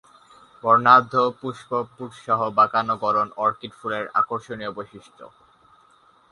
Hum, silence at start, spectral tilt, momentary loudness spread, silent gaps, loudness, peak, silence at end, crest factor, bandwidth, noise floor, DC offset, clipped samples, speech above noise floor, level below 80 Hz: none; 0.65 s; -6 dB/octave; 18 LU; none; -21 LUFS; -2 dBFS; 1.05 s; 22 dB; 11 kHz; -57 dBFS; under 0.1%; under 0.1%; 35 dB; -66 dBFS